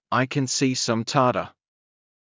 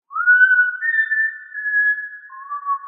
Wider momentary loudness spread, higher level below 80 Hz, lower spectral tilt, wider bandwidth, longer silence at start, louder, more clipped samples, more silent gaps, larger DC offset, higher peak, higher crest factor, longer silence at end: second, 6 LU vs 18 LU; first, -62 dBFS vs under -90 dBFS; first, -4 dB/octave vs 14 dB/octave; first, 7.8 kHz vs 3.8 kHz; about the same, 0.1 s vs 0.1 s; second, -23 LUFS vs -16 LUFS; neither; neither; neither; about the same, -6 dBFS vs -4 dBFS; about the same, 18 dB vs 16 dB; first, 0.9 s vs 0 s